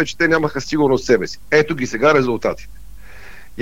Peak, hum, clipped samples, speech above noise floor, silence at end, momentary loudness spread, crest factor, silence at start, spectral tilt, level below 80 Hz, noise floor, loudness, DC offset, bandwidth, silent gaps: -2 dBFS; none; under 0.1%; 23 dB; 0 s; 8 LU; 16 dB; 0 s; -5 dB/octave; -42 dBFS; -40 dBFS; -17 LUFS; 2%; 16 kHz; none